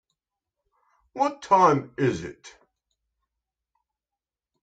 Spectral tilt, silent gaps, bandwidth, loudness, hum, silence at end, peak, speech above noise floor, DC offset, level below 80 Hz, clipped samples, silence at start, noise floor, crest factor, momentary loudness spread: -6.5 dB/octave; none; 9.2 kHz; -23 LUFS; none; 2.15 s; -6 dBFS; 67 dB; under 0.1%; -64 dBFS; under 0.1%; 1.15 s; -90 dBFS; 22 dB; 19 LU